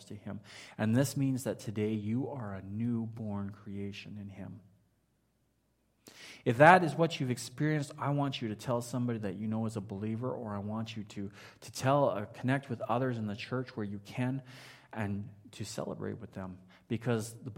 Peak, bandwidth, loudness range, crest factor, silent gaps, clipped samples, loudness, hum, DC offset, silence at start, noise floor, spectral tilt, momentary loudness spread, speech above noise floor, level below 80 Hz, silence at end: -6 dBFS; 16 kHz; 11 LU; 28 dB; none; under 0.1%; -33 LUFS; none; under 0.1%; 0 s; -75 dBFS; -6 dB/octave; 16 LU; 42 dB; -72 dBFS; 0 s